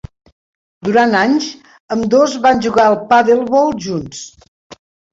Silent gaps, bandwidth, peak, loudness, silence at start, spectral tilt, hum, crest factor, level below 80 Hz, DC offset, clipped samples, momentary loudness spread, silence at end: 1.80-1.88 s, 4.48-4.70 s; 7.8 kHz; -2 dBFS; -13 LUFS; 0.85 s; -5 dB/octave; none; 14 dB; -50 dBFS; under 0.1%; under 0.1%; 14 LU; 0.4 s